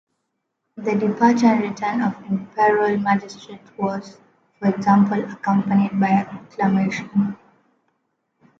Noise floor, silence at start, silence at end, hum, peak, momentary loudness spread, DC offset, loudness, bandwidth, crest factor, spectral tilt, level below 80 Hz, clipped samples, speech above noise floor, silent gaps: -76 dBFS; 0.75 s; 1.25 s; none; -2 dBFS; 11 LU; under 0.1%; -20 LUFS; 7.2 kHz; 18 dB; -7.5 dB/octave; -64 dBFS; under 0.1%; 56 dB; none